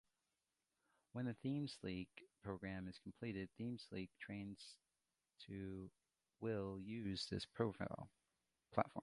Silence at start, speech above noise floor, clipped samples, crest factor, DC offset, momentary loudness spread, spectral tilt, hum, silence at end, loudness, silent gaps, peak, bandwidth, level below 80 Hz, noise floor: 1.15 s; over 42 dB; under 0.1%; 28 dB; under 0.1%; 12 LU; -6.5 dB/octave; none; 0 s; -49 LUFS; none; -20 dBFS; 11.5 kHz; -70 dBFS; under -90 dBFS